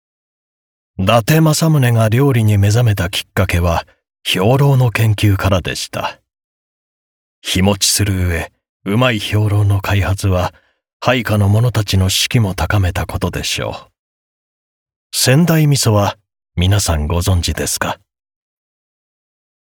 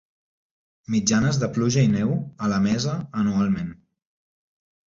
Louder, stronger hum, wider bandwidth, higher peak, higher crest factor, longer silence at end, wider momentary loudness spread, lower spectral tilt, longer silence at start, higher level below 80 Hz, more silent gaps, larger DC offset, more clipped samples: first, -15 LUFS vs -23 LUFS; neither; first, 19 kHz vs 7.6 kHz; first, -2 dBFS vs -6 dBFS; about the same, 14 dB vs 18 dB; first, 1.7 s vs 1.15 s; first, 10 LU vs 7 LU; about the same, -5 dB/octave vs -5.5 dB/octave; about the same, 1 s vs 0.9 s; first, -36 dBFS vs -52 dBFS; first, 6.44-7.42 s, 8.69-8.80 s, 10.93-11.00 s, 13.99-14.86 s, 14.96-15.10 s vs none; neither; neither